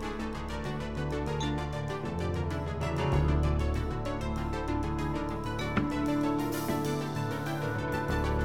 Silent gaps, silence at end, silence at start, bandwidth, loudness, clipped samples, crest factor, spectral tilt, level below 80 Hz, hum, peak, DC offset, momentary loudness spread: none; 0 s; 0 s; 17.5 kHz; -32 LUFS; under 0.1%; 16 dB; -6.5 dB/octave; -38 dBFS; none; -16 dBFS; 0.4%; 6 LU